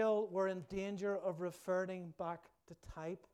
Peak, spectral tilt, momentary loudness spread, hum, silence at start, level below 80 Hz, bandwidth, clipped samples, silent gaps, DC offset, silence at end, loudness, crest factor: -26 dBFS; -6.5 dB/octave; 12 LU; none; 0 s; -66 dBFS; 14.5 kHz; under 0.1%; none; under 0.1%; 0.15 s; -41 LUFS; 14 dB